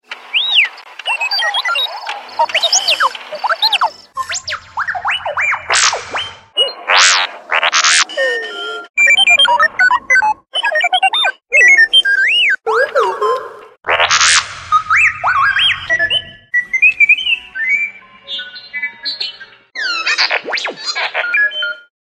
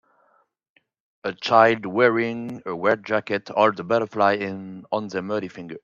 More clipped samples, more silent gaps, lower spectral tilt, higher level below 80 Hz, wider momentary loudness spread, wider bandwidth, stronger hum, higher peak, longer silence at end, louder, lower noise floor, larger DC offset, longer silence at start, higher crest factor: neither; first, 8.90-8.94 s vs none; second, 1.5 dB/octave vs -6 dB/octave; first, -54 dBFS vs -70 dBFS; about the same, 14 LU vs 14 LU; first, 15 kHz vs 7.4 kHz; neither; about the same, 0 dBFS vs 0 dBFS; first, 0.25 s vs 0.05 s; first, -12 LUFS vs -22 LUFS; second, -33 dBFS vs -67 dBFS; neither; second, 0.1 s vs 1.25 s; second, 14 dB vs 22 dB